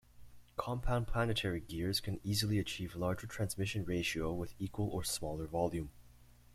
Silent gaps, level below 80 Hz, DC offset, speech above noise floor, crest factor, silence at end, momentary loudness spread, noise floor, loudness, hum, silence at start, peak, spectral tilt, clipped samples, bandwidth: none; -50 dBFS; under 0.1%; 24 dB; 18 dB; 0.25 s; 6 LU; -60 dBFS; -38 LUFS; 60 Hz at -55 dBFS; 0.15 s; -18 dBFS; -5 dB/octave; under 0.1%; 16 kHz